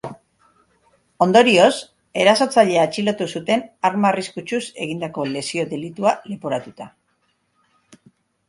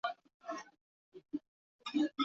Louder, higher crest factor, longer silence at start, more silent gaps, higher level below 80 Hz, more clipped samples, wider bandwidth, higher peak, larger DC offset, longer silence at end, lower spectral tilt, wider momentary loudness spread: first, -19 LUFS vs -42 LUFS; about the same, 20 dB vs 20 dB; about the same, 0.05 s vs 0.05 s; second, none vs 0.34-0.40 s, 0.81-1.12 s, 1.48-1.79 s; first, -64 dBFS vs -86 dBFS; neither; first, 11.5 kHz vs 7.6 kHz; first, 0 dBFS vs -22 dBFS; neither; first, 1.6 s vs 0 s; first, -4.5 dB/octave vs -1.5 dB/octave; second, 14 LU vs 23 LU